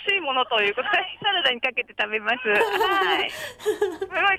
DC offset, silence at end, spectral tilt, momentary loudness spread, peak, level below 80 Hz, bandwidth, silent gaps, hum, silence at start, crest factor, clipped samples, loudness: under 0.1%; 0 s; -2 dB/octave; 5 LU; -10 dBFS; -62 dBFS; 16 kHz; none; none; 0 s; 14 dB; under 0.1%; -22 LUFS